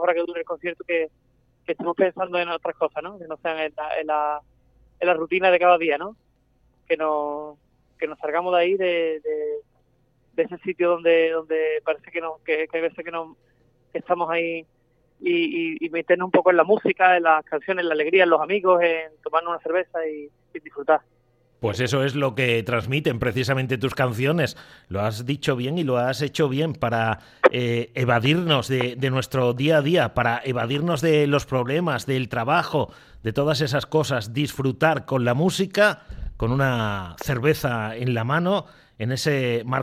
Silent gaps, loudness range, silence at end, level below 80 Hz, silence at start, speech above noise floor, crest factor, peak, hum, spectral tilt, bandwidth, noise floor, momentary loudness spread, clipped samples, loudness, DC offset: none; 6 LU; 0 s; -50 dBFS; 0 s; 41 dB; 22 dB; 0 dBFS; none; -6 dB/octave; 15.5 kHz; -63 dBFS; 11 LU; under 0.1%; -23 LUFS; under 0.1%